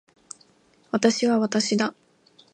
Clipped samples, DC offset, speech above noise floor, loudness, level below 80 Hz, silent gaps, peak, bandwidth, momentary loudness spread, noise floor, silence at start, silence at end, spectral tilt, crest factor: under 0.1%; under 0.1%; 38 dB; -23 LUFS; -74 dBFS; none; -4 dBFS; 10.5 kHz; 23 LU; -60 dBFS; 0.95 s; 0.65 s; -4 dB/octave; 22 dB